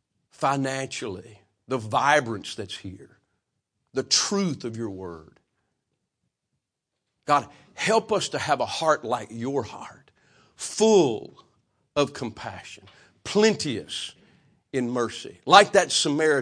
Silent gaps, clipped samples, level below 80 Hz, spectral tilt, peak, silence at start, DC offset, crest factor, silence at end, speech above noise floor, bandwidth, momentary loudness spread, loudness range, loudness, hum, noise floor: none; under 0.1%; -66 dBFS; -3.5 dB/octave; 0 dBFS; 0.4 s; under 0.1%; 26 dB; 0 s; 58 dB; 10.5 kHz; 19 LU; 6 LU; -24 LUFS; none; -83 dBFS